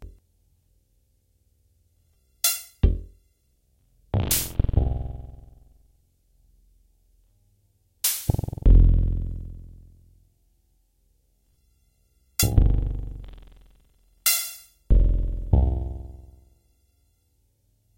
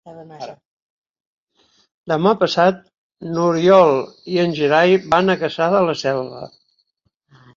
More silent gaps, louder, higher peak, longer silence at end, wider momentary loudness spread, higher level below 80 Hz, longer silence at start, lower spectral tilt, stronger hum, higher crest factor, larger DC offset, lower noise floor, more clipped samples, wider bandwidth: second, none vs 0.65-1.14 s, 1.26-1.47 s, 1.94-2.04 s, 2.98-3.10 s; second, -24 LUFS vs -16 LUFS; about the same, -4 dBFS vs -2 dBFS; first, 1.75 s vs 1.1 s; about the same, 21 LU vs 22 LU; first, -28 dBFS vs -58 dBFS; about the same, 0 s vs 0.05 s; second, -4 dB/octave vs -6 dB/octave; neither; about the same, 22 dB vs 18 dB; neither; about the same, -67 dBFS vs -69 dBFS; neither; first, 16 kHz vs 7.4 kHz